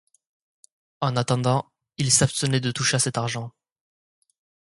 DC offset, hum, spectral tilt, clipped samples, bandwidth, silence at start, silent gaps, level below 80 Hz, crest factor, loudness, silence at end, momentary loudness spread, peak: under 0.1%; none; -3.5 dB/octave; under 0.1%; 11.5 kHz; 1 s; none; -58 dBFS; 22 dB; -23 LUFS; 1.2 s; 12 LU; -4 dBFS